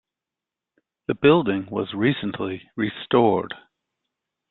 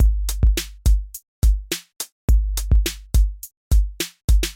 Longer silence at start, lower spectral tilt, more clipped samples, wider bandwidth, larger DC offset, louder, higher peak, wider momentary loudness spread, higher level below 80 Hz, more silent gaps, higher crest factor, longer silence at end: first, 1.1 s vs 0 s; first, -11 dB/octave vs -4.5 dB/octave; neither; second, 4.3 kHz vs 17 kHz; neither; about the same, -22 LUFS vs -22 LUFS; first, -4 dBFS vs -8 dBFS; first, 14 LU vs 7 LU; second, -60 dBFS vs -20 dBFS; second, none vs 1.28-1.42 s, 2.12-2.28 s, 3.57-3.71 s, 4.24-4.28 s; first, 20 dB vs 10 dB; first, 0.95 s vs 0 s